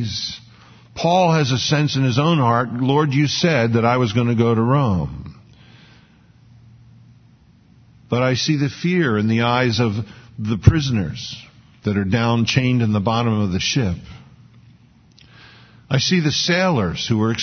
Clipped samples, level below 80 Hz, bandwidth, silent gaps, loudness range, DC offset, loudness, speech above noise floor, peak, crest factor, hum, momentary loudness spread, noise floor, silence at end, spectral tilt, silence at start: under 0.1%; -40 dBFS; 6.6 kHz; none; 7 LU; under 0.1%; -18 LUFS; 33 dB; 0 dBFS; 20 dB; none; 12 LU; -51 dBFS; 0 s; -5.5 dB/octave; 0 s